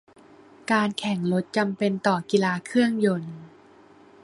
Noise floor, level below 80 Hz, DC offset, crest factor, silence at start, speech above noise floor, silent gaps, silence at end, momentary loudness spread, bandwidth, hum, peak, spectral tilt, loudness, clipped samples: -52 dBFS; -68 dBFS; under 0.1%; 20 dB; 0.7 s; 29 dB; none; 0.75 s; 9 LU; 11.5 kHz; none; -6 dBFS; -6 dB/octave; -24 LUFS; under 0.1%